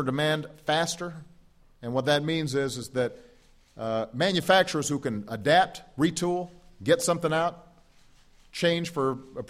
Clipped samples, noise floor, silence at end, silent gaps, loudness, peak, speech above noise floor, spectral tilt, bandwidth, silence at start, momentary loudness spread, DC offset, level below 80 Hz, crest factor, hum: under 0.1%; -57 dBFS; 0 s; none; -27 LUFS; -8 dBFS; 31 dB; -4.5 dB/octave; 15.5 kHz; 0 s; 11 LU; under 0.1%; -60 dBFS; 20 dB; none